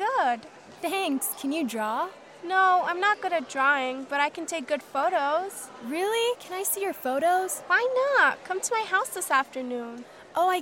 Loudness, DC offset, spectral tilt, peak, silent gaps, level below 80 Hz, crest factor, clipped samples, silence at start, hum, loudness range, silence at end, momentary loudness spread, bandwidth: -26 LUFS; under 0.1%; -1.5 dB/octave; -10 dBFS; none; -78 dBFS; 18 dB; under 0.1%; 0 s; none; 2 LU; 0 s; 12 LU; 16.5 kHz